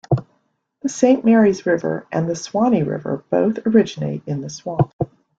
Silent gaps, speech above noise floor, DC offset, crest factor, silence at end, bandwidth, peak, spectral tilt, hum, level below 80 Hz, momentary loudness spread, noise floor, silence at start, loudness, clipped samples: 4.93-4.99 s; 48 dB; under 0.1%; 18 dB; 0.35 s; 8 kHz; -2 dBFS; -7 dB/octave; none; -52 dBFS; 12 LU; -66 dBFS; 0.1 s; -19 LUFS; under 0.1%